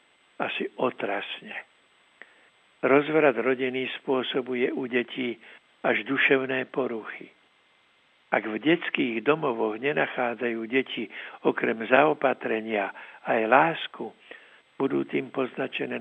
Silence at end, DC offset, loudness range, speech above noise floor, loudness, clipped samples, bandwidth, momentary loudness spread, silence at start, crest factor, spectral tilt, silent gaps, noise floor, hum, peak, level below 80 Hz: 0 s; under 0.1%; 3 LU; 37 dB; -26 LUFS; under 0.1%; 7.6 kHz; 13 LU; 0.4 s; 24 dB; -7.5 dB/octave; none; -63 dBFS; none; -2 dBFS; -88 dBFS